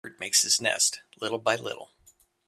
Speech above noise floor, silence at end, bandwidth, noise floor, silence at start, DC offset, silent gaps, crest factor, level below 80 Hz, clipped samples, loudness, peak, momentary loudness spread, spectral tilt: 35 dB; 0.6 s; 15.5 kHz; -62 dBFS; 0.05 s; under 0.1%; none; 22 dB; -74 dBFS; under 0.1%; -25 LUFS; -6 dBFS; 14 LU; 0 dB/octave